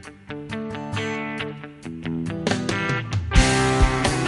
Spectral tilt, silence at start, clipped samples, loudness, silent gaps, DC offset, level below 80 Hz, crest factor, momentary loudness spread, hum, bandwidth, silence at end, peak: -4.5 dB/octave; 0 s; under 0.1%; -23 LUFS; none; under 0.1%; -28 dBFS; 20 dB; 15 LU; none; 11.5 kHz; 0 s; -4 dBFS